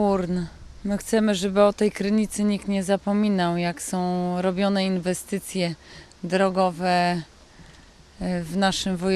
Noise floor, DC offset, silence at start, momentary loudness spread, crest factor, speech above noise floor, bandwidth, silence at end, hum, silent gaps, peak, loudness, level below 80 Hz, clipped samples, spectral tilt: -49 dBFS; under 0.1%; 0 s; 8 LU; 18 dB; 26 dB; 14.5 kHz; 0 s; none; none; -6 dBFS; -24 LUFS; -50 dBFS; under 0.1%; -5.5 dB/octave